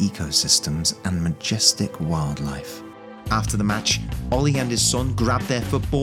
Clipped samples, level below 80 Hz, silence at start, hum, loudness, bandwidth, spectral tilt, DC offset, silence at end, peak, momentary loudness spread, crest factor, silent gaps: under 0.1%; -36 dBFS; 0 s; none; -21 LUFS; 17 kHz; -3.5 dB/octave; under 0.1%; 0 s; -2 dBFS; 12 LU; 20 dB; none